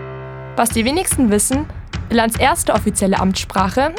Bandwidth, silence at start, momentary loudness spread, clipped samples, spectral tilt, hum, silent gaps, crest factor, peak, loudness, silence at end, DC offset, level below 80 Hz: 19.5 kHz; 0 s; 12 LU; under 0.1%; -4 dB/octave; none; none; 16 dB; 0 dBFS; -16 LUFS; 0 s; under 0.1%; -32 dBFS